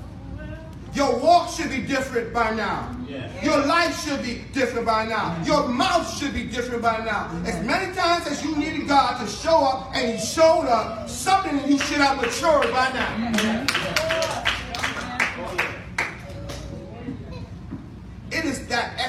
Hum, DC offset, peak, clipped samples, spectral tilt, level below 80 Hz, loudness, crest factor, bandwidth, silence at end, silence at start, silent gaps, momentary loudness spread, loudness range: none; under 0.1%; 0 dBFS; under 0.1%; -4 dB/octave; -44 dBFS; -22 LUFS; 22 dB; 16 kHz; 0 s; 0 s; none; 16 LU; 7 LU